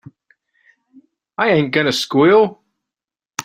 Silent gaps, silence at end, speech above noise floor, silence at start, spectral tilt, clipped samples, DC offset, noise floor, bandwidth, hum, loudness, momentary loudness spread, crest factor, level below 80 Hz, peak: none; 0.05 s; 74 dB; 1.4 s; -5 dB/octave; under 0.1%; under 0.1%; -88 dBFS; 14.5 kHz; none; -15 LUFS; 13 LU; 18 dB; -62 dBFS; -2 dBFS